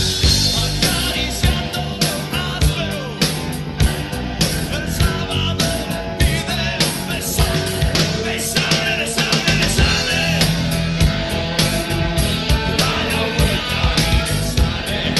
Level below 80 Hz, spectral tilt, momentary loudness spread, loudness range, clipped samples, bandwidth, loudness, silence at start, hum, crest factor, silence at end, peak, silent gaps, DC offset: -26 dBFS; -4 dB/octave; 5 LU; 3 LU; under 0.1%; 12.5 kHz; -18 LUFS; 0 s; none; 14 dB; 0 s; -4 dBFS; none; under 0.1%